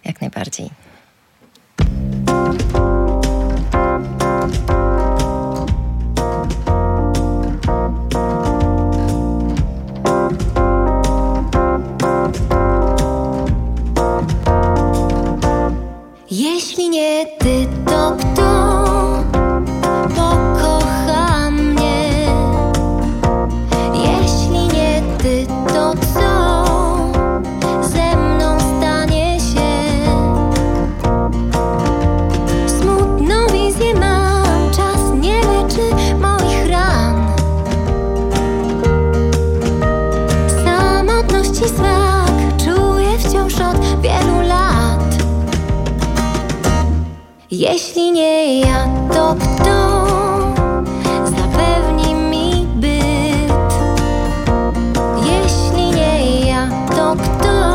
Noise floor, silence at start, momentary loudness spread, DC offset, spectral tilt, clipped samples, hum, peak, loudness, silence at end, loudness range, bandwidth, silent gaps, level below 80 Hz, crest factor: -52 dBFS; 0.05 s; 5 LU; under 0.1%; -6 dB/octave; under 0.1%; none; 0 dBFS; -15 LUFS; 0 s; 4 LU; 16 kHz; none; -20 dBFS; 14 dB